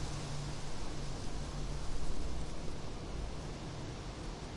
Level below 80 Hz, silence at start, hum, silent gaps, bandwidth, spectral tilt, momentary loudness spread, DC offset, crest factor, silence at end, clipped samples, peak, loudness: -44 dBFS; 0 s; none; none; 11.5 kHz; -5 dB/octave; 3 LU; under 0.1%; 14 dB; 0 s; under 0.1%; -24 dBFS; -44 LUFS